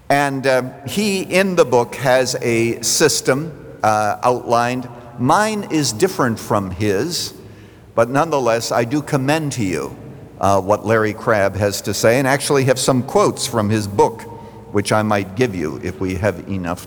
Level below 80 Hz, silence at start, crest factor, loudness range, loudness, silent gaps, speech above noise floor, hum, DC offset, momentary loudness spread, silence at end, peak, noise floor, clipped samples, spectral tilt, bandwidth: -50 dBFS; 0.1 s; 16 dB; 3 LU; -18 LUFS; none; 23 dB; none; under 0.1%; 9 LU; 0 s; -2 dBFS; -40 dBFS; under 0.1%; -4.5 dB/octave; over 20 kHz